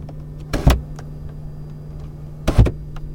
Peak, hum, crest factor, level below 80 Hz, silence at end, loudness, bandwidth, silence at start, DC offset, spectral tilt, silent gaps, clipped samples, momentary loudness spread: -2 dBFS; none; 18 dB; -24 dBFS; 0 s; -20 LUFS; 17 kHz; 0 s; under 0.1%; -7 dB/octave; none; under 0.1%; 17 LU